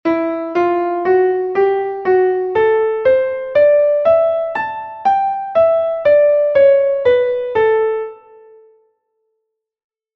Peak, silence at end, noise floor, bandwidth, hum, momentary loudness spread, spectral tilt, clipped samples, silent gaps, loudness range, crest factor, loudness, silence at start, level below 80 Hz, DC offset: -2 dBFS; 2 s; -75 dBFS; 5.8 kHz; none; 8 LU; -7.5 dB/octave; under 0.1%; none; 2 LU; 12 dB; -15 LUFS; 0.05 s; -56 dBFS; under 0.1%